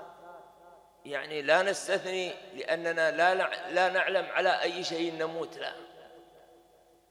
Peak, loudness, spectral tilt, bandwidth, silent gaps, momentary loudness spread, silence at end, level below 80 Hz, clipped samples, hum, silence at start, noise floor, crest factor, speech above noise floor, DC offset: -8 dBFS; -29 LUFS; -3 dB/octave; 14.5 kHz; none; 14 LU; 0.85 s; -78 dBFS; under 0.1%; none; 0 s; -62 dBFS; 22 dB; 32 dB; under 0.1%